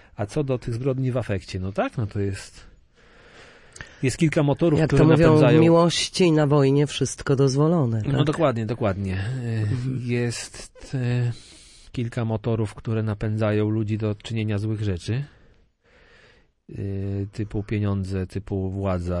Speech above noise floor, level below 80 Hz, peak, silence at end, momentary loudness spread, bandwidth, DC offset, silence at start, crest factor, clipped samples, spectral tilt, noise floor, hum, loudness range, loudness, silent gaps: 36 dB; -46 dBFS; -2 dBFS; 0 s; 13 LU; 11.5 kHz; under 0.1%; 0.2 s; 20 dB; under 0.1%; -6.5 dB/octave; -58 dBFS; none; 12 LU; -23 LUFS; none